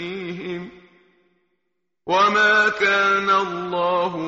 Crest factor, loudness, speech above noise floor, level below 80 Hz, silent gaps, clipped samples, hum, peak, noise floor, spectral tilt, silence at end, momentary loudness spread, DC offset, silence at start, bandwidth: 16 dB; -18 LUFS; 59 dB; -64 dBFS; none; under 0.1%; none; -6 dBFS; -78 dBFS; -1 dB/octave; 0 s; 17 LU; under 0.1%; 0 s; 8 kHz